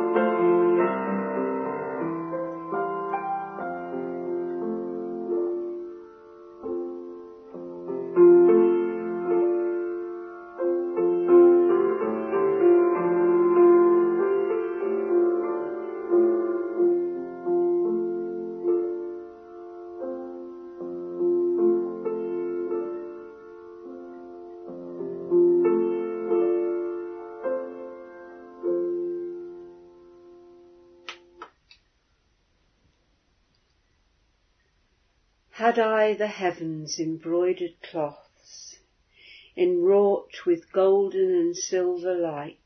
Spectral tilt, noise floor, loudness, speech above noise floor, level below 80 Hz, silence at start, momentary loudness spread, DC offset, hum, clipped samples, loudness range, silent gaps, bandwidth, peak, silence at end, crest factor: -6 dB/octave; -68 dBFS; -24 LUFS; 43 dB; -72 dBFS; 0 s; 21 LU; under 0.1%; none; under 0.1%; 12 LU; none; 6.4 kHz; -8 dBFS; 0.15 s; 18 dB